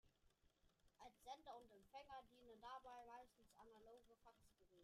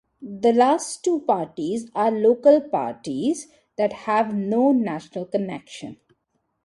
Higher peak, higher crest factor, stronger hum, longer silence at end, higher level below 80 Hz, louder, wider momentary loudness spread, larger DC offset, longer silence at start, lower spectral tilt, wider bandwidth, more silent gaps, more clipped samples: second, -46 dBFS vs -4 dBFS; about the same, 20 dB vs 18 dB; neither; second, 0 s vs 0.7 s; second, -82 dBFS vs -68 dBFS; second, -63 LUFS vs -22 LUFS; second, 9 LU vs 15 LU; neither; second, 0.05 s vs 0.2 s; second, -3.5 dB/octave vs -5.5 dB/octave; first, 14.5 kHz vs 11.5 kHz; neither; neither